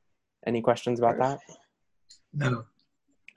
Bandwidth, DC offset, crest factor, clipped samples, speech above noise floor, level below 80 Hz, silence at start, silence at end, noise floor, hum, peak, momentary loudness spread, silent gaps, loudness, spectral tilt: 11.5 kHz; under 0.1%; 22 dB; under 0.1%; 46 dB; -66 dBFS; 0.45 s; 0.7 s; -73 dBFS; none; -10 dBFS; 13 LU; none; -28 LUFS; -7 dB/octave